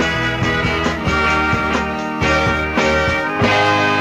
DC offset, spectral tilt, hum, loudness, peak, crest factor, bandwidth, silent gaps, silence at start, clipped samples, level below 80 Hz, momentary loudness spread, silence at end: under 0.1%; -5 dB/octave; none; -16 LUFS; -4 dBFS; 14 dB; 15.5 kHz; none; 0 s; under 0.1%; -32 dBFS; 4 LU; 0 s